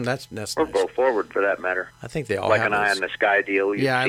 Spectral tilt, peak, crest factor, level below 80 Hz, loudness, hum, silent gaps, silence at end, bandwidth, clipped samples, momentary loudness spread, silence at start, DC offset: -4.5 dB/octave; -6 dBFS; 18 dB; -56 dBFS; -22 LUFS; none; none; 0 s; 15.5 kHz; under 0.1%; 9 LU; 0 s; under 0.1%